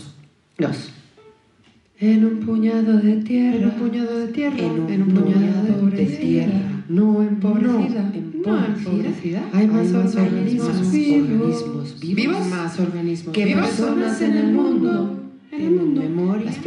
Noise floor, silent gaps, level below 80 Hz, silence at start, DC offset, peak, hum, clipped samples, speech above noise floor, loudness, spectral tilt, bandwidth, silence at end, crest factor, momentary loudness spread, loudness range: -55 dBFS; none; -66 dBFS; 0 s; under 0.1%; -6 dBFS; none; under 0.1%; 37 dB; -19 LUFS; -7.5 dB/octave; 10.5 kHz; 0 s; 12 dB; 8 LU; 2 LU